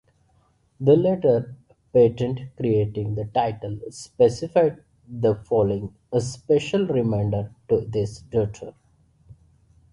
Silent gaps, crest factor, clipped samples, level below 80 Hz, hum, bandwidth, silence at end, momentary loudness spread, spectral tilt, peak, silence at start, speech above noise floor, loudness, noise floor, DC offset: none; 18 dB; under 0.1%; -50 dBFS; none; 11 kHz; 0.6 s; 11 LU; -7.5 dB/octave; -4 dBFS; 0.8 s; 41 dB; -23 LUFS; -63 dBFS; under 0.1%